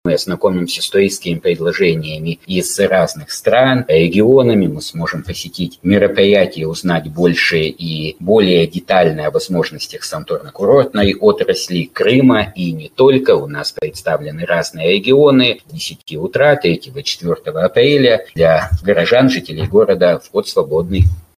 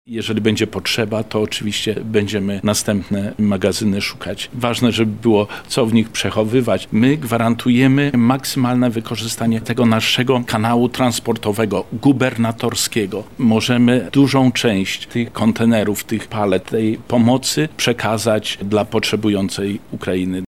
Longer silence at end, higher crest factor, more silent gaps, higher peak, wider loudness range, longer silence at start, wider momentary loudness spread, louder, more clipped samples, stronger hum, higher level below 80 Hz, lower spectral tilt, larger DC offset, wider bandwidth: first, 0.2 s vs 0.05 s; about the same, 14 dB vs 14 dB; neither; about the same, 0 dBFS vs -2 dBFS; about the same, 2 LU vs 3 LU; about the same, 0.05 s vs 0.1 s; first, 11 LU vs 7 LU; first, -14 LUFS vs -17 LUFS; neither; neither; first, -36 dBFS vs -48 dBFS; about the same, -5.5 dB/octave vs -5 dB/octave; second, under 0.1% vs 0.6%; about the same, 16 kHz vs 15.5 kHz